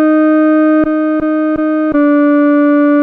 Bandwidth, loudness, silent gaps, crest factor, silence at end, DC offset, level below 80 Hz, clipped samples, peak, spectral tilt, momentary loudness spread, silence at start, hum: 3.8 kHz; -11 LUFS; none; 6 dB; 0 s; under 0.1%; -44 dBFS; under 0.1%; -4 dBFS; -8.5 dB/octave; 4 LU; 0 s; none